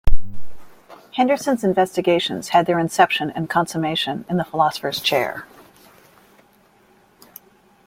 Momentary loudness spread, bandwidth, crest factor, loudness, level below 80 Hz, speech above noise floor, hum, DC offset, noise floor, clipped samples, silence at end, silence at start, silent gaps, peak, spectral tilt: 8 LU; 16 kHz; 18 dB; -20 LUFS; -32 dBFS; 36 dB; none; under 0.1%; -55 dBFS; under 0.1%; 2.4 s; 0.05 s; none; 0 dBFS; -4.5 dB/octave